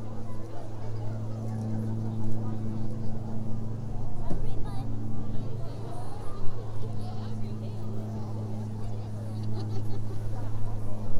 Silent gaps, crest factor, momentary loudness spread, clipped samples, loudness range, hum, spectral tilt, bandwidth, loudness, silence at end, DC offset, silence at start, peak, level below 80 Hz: none; 16 dB; 6 LU; under 0.1%; 3 LU; none; -8.5 dB/octave; 6.4 kHz; -36 LUFS; 0 s; under 0.1%; 0 s; -10 dBFS; -38 dBFS